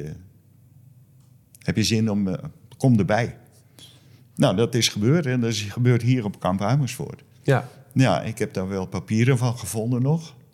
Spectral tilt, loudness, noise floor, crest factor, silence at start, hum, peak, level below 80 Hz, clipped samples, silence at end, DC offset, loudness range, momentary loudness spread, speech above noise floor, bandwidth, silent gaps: -6 dB/octave; -23 LUFS; -54 dBFS; 18 dB; 0 s; none; -6 dBFS; -60 dBFS; under 0.1%; 0.25 s; under 0.1%; 3 LU; 11 LU; 32 dB; 15 kHz; none